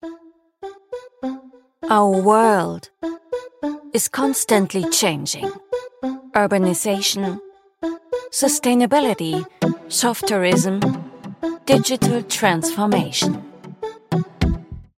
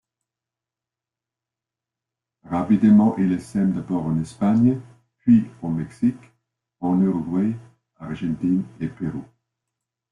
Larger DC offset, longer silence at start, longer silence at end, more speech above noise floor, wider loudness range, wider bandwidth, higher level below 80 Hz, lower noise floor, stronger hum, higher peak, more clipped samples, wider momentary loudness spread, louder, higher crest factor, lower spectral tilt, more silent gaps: neither; second, 0.05 s vs 2.45 s; second, 0.15 s vs 0.9 s; second, 29 dB vs 68 dB; second, 2 LU vs 6 LU; first, 16 kHz vs 11 kHz; first, -42 dBFS vs -56 dBFS; second, -48 dBFS vs -89 dBFS; neither; first, -2 dBFS vs -6 dBFS; neither; about the same, 16 LU vs 14 LU; about the same, -20 LUFS vs -22 LUFS; about the same, 18 dB vs 16 dB; second, -4 dB/octave vs -9 dB/octave; neither